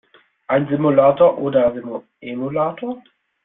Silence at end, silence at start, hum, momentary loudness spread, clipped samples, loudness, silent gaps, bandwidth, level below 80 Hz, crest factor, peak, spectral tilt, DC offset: 0.45 s; 0.5 s; none; 17 LU; under 0.1%; -17 LUFS; none; 3.9 kHz; -58 dBFS; 16 dB; -2 dBFS; -12 dB/octave; under 0.1%